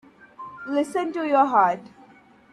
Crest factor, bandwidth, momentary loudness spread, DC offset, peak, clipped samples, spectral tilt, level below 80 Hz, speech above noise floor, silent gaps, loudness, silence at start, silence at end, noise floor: 18 dB; 12.5 kHz; 20 LU; under 0.1%; -6 dBFS; under 0.1%; -5.5 dB/octave; -72 dBFS; 31 dB; none; -22 LUFS; 0.4 s; 0.65 s; -52 dBFS